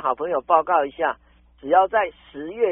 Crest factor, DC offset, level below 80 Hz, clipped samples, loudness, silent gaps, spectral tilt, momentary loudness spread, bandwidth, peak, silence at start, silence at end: 18 dB; under 0.1%; -56 dBFS; under 0.1%; -21 LUFS; none; 2.5 dB/octave; 18 LU; 3.8 kHz; -2 dBFS; 0 s; 0 s